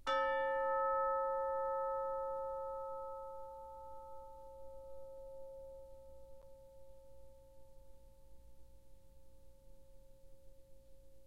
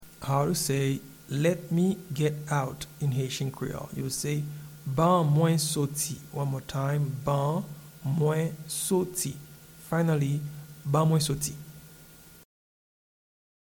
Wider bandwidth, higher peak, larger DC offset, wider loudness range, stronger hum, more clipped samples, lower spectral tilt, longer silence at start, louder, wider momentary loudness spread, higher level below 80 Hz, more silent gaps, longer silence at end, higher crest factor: second, 12.5 kHz vs 19 kHz; second, -24 dBFS vs -12 dBFS; first, 0.1% vs under 0.1%; first, 26 LU vs 3 LU; neither; neither; second, -4 dB/octave vs -5.5 dB/octave; about the same, 0 s vs 0 s; second, -40 LUFS vs -28 LUFS; first, 26 LU vs 12 LU; second, -64 dBFS vs -58 dBFS; neither; second, 0.05 s vs 1.5 s; about the same, 18 dB vs 18 dB